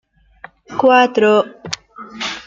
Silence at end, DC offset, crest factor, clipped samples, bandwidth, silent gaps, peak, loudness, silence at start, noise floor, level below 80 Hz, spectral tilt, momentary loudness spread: 0.05 s; under 0.1%; 16 dB; under 0.1%; 7.8 kHz; none; -2 dBFS; -14 LUFS; 0.7 s; -42 dBFS; -58 dBFS; -4 dB/octave; 16 LU